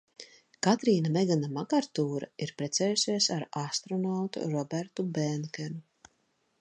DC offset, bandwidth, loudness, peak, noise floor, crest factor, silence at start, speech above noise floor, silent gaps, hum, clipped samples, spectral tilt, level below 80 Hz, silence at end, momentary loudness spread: under 0.1%; 10 kHz; -30 LUFS; -10 dBFS; -74 dBFS; 20 dB; 0.2 s; 44 dB; none; none; under 0.1%; -4.5 dB/octave; -78 dBFS; 0.8 s; 12 LU